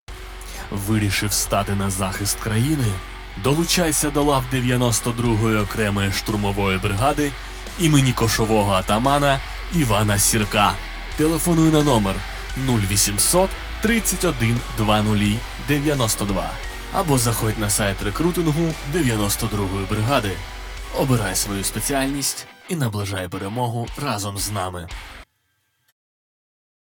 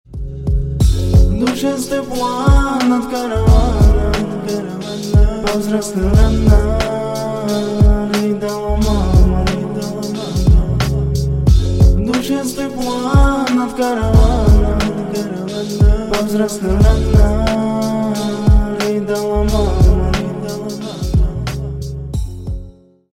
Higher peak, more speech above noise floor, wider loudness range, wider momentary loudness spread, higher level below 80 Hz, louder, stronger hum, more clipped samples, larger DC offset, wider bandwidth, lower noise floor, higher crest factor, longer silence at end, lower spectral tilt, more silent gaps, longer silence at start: about the same, -2 dBFS vs 0 dBFS; first, 49 dB vs 25 dB; first, 5 LU vs 2 LU; about the same, 11 LU vs 10 LU; second, -34 dBFS vs -16 dBFS; second, -20 LUFS vs -16 LUFS; neither; neither; neither; first, over 20 kHz vs 16 kHz; first, -69 dBFS vs -37 dBFS; first, 20 dB vs 12 dB; first, 1.65 s vs 0.4 s; second, -4.5 dB/octave vs -6.5 dB/octave; neither; about the same, 0.1 s vs 0.1 s